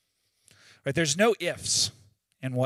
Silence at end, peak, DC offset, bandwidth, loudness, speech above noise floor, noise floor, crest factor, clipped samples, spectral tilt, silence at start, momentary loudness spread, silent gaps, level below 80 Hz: 0 s; -10 dBFS; under 0.1%; 16 kHz; -26 LUFS; 41 dB; -67 dBFS; 20 dB; under 0.1%; -3 dB/octave; 0.85 s; 12 LU; none; -66 dBFS